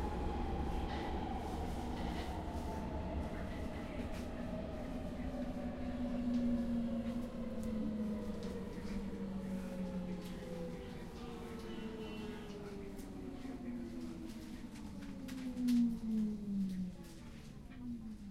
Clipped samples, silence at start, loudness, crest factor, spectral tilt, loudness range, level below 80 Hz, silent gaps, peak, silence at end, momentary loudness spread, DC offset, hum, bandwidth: under 0.1%; 0 s; -42 LUFS; 16 dB; -7 dB/octave; 7 LU; -48 dBFS; none; -26 dBFS; 0 s; 11 LU; under 0.1%; none; 15 kHz